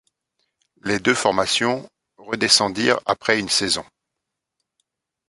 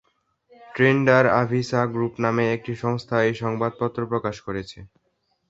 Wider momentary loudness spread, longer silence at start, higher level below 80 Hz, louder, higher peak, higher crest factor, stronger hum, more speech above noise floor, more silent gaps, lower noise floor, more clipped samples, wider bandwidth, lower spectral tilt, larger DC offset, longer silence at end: second, 10 LU vs 14 LU; first, 0.85 s vs 0.6 s; about the same, -58 dBFS vs -56 dBFS; first, -19 LUFS vs -22 LUFS; about the same, 0 dBFS vs -2 dBFS; about the same, 22 dB vs 20 dB; neither; first, 62 dB vs 49 dB; neither; first, -82 dBFS vs -71 dBFS; neither; first, 11.5 kHz vs 7.8 kHz; second, -2 dB/octave vs -7 dB/octave; neither; first, 1.45 s vs 0.65 s